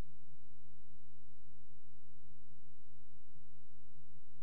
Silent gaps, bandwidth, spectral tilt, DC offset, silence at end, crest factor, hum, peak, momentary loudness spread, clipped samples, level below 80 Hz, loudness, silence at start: none; 5.6 kHz; -9.5 dB/octave; 3%; 0 s; 12 dB; none; -30 dBFS; 1 LU; under 0.1%; -72 dBFS; -67 LUFS; 0 s